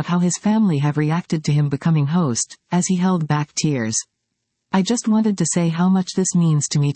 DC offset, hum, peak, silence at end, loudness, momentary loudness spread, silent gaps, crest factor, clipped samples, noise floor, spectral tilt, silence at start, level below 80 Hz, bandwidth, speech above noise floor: under 0.1%; none; -4 dBFS; 0 s; -19 LUFS; 4 LU; none; 14 dB; under 0.1%; -76 dBFS; -5.5 dB/octave; 0 s; -62 dBFS; 8.8 kHz; 57 dB